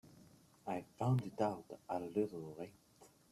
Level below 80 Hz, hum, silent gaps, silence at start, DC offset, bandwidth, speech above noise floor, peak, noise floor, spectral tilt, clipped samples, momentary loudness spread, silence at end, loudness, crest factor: -76 dBFS; none; none; 0.05 s; under 0.1%; 13.5 kHz; 25 dB; -22 dBFS; -65 dBFS; -8 dB/octave; under 0.1%; 14 LU; 0.25 s; -41 LUFS; 20 dB